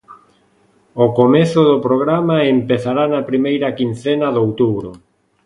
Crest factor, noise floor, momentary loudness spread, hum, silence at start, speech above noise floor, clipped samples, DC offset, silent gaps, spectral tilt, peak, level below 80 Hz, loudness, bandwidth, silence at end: 16 dB; -55 dBFS; 7 LU; none; 0.1 s; 41 dB; under 0.1%; under 0.1%; none; -7.5 dB/octave; 0 dBFS; -54 dBFS; -15 LUFS; 11 kHz; 0.5 s